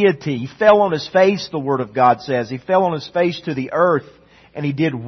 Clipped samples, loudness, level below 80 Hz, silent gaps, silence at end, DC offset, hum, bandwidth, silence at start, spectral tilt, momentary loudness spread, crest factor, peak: under 0.1%; -18 LUFS; -58 dBFS; none; 0 s; under 0.1%; none; 6.4 kHz; 0 s; -6.5 dB/octave; 10 LU; 16 dB; 0 dBFS